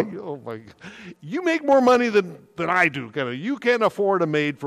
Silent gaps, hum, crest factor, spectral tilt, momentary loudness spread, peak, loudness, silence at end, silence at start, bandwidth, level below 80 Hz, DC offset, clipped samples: none; none; 16 dB; -5.5 dB/octave; 20 LU; -6 dBFS; -21 LUFS; 0 s; 0 s; 14 kHz; -68 dBFS; under 0.1%; under 0.1%